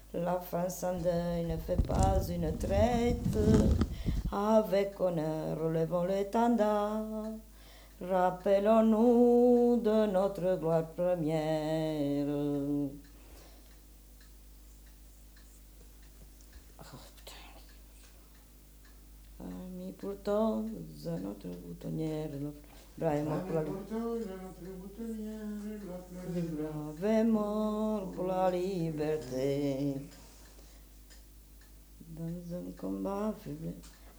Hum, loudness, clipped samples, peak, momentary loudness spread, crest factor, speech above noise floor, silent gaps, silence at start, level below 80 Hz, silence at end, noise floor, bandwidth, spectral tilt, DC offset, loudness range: none; -32 LUFS; under 0.1%; -12 dBFS; 17 LU; 20 dB; 25 dB; none; 0 s; -46 dBFS; 0 s; -56 dBFS; over 20 kHz; -7.5 dB/octave; under 0.1%; 15 LU